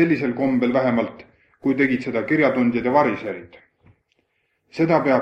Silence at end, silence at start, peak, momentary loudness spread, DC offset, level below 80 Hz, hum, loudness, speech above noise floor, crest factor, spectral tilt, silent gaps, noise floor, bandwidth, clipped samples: 0 s; 0 s; -4 dBFS; 11 LU; under 0.1%; -60 dBFS; none; -20 LUFS; 50 dB; 16 dB; -8 dB/octave; none; -70 dBFS; 6.4 kHz; under 0.1%